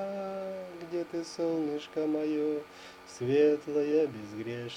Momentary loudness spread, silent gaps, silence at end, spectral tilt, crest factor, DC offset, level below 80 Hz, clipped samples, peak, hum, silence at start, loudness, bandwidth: 14 LU; none; 0 s; -6 dB/octave; 16 dB; under 0.1%; -74 dBFS; under 0.1%; -14 dBFS; none; 0 s; -32 LUFS; 11 kHz